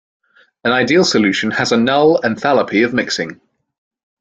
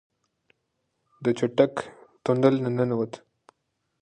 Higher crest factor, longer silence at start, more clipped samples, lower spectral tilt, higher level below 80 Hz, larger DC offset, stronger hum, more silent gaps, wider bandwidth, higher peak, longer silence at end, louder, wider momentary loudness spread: second, 16 dB vs 22 dB; second, 0.65 s vs 1.2 s; neither; second, -4.5 dB/octave vs -7.5 dB/octave; first, -56 dBFS vs -68 dBFS; neither; neither; neither; about the same, 9.2 kHz vs 9.8 kHz; first, 0 dBFS vs -6 dBFS; about the same, 0.85 s vs 0.85 s; first, -14 LUFS vs -25 LUFS; second, 8 LU vs 14 LU